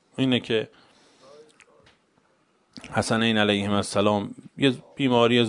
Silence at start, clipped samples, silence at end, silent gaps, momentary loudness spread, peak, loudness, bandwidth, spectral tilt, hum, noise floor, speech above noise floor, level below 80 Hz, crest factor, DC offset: 0.2 s; under 0.1%; 0 s; none; 9 LU; -4 dBFS; -23 LUFS; 11 kHz; -5 dB/octave; none; -65 dBFS; 42 dB; -64 dBFS; 22 dB; under 0.1%